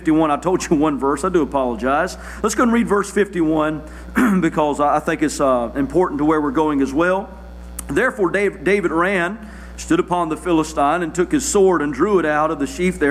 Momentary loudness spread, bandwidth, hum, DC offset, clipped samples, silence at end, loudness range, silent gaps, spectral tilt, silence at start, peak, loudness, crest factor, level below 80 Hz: 7 LU; 15 kHz; 60 Hz at -40 dBFS; under 0.1%; under 0.1%; 0 s; 1 LU; none; -5.5 dB/octave; 0 s; -6 dBFS; -18 LUFS; 12 dB; -38 dBFS